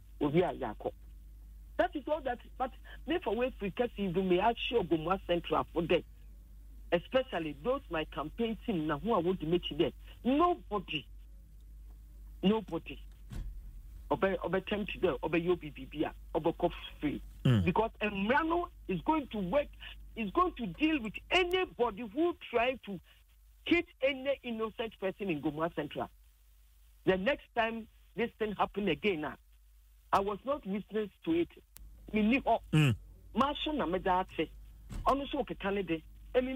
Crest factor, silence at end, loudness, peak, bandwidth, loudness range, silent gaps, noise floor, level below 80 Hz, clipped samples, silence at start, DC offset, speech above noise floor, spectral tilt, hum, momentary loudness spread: 18 dB; 0 s; -33 LUFS; -16 dBFS; 16 kHz; 4 LU; none; -62 dBFS; -52 dBFS; under 0.1%; 0 s; under 0.1%; 29 dB; -7 dB/octave; none; 11 LU